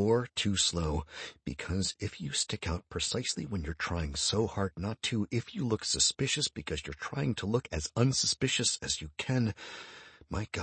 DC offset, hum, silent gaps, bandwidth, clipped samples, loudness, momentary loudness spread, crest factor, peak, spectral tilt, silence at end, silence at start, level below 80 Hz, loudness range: under 0.1%; none; none; 8.8 kHz; under 0.1%; -32 LUFS; 12 LU; 20 dB; -12 dBFS; -3.5 dB/octave; 0 s; 0 s; -48 dBFS; 3 LU